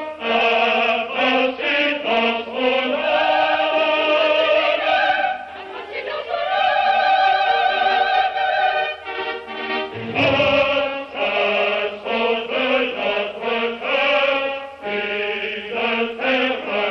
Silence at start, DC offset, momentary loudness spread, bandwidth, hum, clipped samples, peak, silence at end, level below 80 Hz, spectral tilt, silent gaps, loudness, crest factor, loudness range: 0 s; under 0.1%; 9 LU; 6.8 kHz; none; under 0.1%; -4 dBFS; 0 s; -56 dBFS; -4.5 dB/octave; none; -19 LUFS; 14 dB; 3 LU